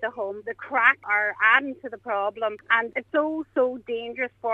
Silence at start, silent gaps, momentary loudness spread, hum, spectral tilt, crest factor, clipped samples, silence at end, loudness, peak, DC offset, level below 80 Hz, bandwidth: 0 s; none; 13 LU; none; -5 dB/octave; 22 dB; under 0.1%; 0 s; -24 LUFS; -4 dBFS; under 0.1%; -70 dBFS; 6.8 kHz